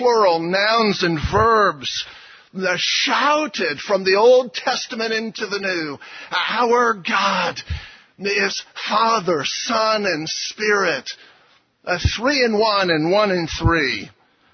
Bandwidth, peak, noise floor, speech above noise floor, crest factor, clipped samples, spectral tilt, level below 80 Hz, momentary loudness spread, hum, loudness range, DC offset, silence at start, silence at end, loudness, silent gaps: 6.6 kHz; -4 dBFS; -56 dBFS; 37 dB; 16 dB; under 0.1%; -4 dB/octave; -38 dBFS; 10 LU; none; 3 LU; under 0.1%; 0 s; 0.45 s; -19 LUFS; none